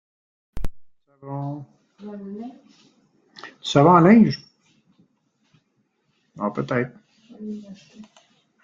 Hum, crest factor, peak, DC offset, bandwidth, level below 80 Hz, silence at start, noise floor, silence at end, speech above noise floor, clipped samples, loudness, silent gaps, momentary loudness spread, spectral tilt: none; 22 dB; -2 dBFS; under 0.1%; 7.6 kHz; -46 dBFS; 0.55 s; -70 dBFS; 0.6 s; 49 dB; under 0.1%; -19 LUFS; none; 27 LU; -7 dB/octave